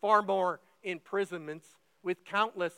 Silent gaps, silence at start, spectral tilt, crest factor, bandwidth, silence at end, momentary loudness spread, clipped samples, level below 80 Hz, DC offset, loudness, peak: none; 0.05 s; -5 dB/octave; 20 dB; 16 kHz; 0.05 s; 14 LU; under 0.1%; under -90 dBFS; under 0.1%; -33 LUFS; -12 dBFS